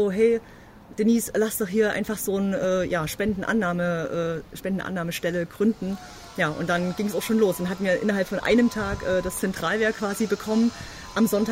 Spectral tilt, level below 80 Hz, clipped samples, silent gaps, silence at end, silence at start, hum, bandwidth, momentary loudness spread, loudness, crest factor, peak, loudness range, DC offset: -5 dB/octave; -48 dBFS; under 0.1%; none; 0 s; 0 s; none; 16 kHz; 7 LU; -25 LUFS; 16 dB; -10 dBFS; 3 LU; under 0.1%